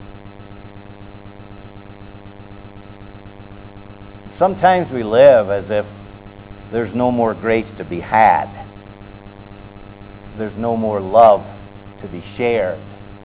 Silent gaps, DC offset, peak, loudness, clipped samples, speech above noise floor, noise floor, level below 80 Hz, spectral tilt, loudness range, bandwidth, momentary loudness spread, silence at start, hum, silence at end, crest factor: none; under 0.1%; 0 dBFS; -16 LUFS; under 0.1%; 22 dB; -37 dBFS; -44 dBFS; -10 dB/octave; 22 LU; 4 kHz; 27 LU; 0 s; none; 0.1 s; 18 dB